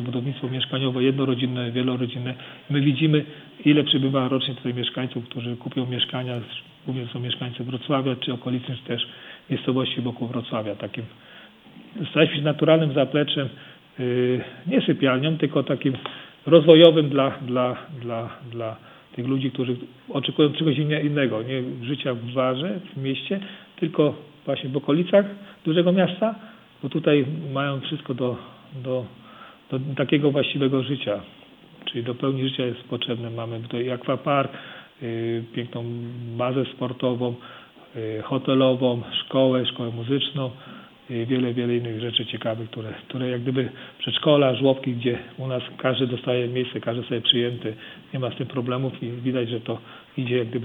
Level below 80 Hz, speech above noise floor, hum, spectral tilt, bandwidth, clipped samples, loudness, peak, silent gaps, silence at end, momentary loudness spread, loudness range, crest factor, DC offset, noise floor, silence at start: -68 dBFS; 24 dB; none; -9 dB/octave; 4.3 kHz; under 0.1%; -24 LUFS; 0 dBFS; none; 0 s; 13 LU; 9 LU; 24 dB; under 0.1%; -47 dBFS; 0 s